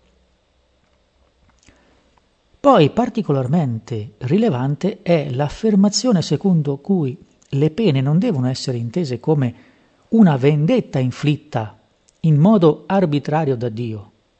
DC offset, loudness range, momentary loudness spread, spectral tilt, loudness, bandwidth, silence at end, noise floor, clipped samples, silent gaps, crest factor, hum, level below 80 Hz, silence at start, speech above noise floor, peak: under 0.1%; 3 LU; 13 LU; -7 dB/octave; -18 LUFS; 8.4 kHz; 0.35 s; -60 dBFS; under 0.1%; none; 18 dB; none; -54 dBFS; 2.65 s; 44 dB; 0 dBFS